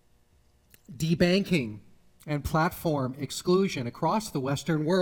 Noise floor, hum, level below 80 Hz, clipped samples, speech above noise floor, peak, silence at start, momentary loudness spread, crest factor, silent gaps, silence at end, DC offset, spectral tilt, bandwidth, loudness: -63 dBFS; none; -50 dBFS; under 0.1%; 36 dB; -10 dBFS; 0.9 s; 10 LU; 18 dB; none; 0 s; under 0.1%; -6 dB/octave; 19 kHz; -28 LUFS